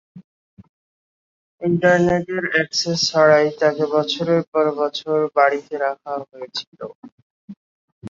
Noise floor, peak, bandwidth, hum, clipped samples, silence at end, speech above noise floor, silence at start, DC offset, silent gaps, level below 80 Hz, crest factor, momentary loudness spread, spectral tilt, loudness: under -90 dBFS; -2 dBFS; 7.8 kHz; none; under 0.1%; 0 s; over 71 dB; 0.15 s; under 0.1%; 0.24-0.57 s, 0.69-1.58 s, 4.47-4.52 s, 6.67-6.72 s, 6.95-7.03 s, 7.12-7.48 s, 7.57-8.01 s; -58 dBFS; 18 dB; 14 LU; -4.5 dB/octave; -19 LUFS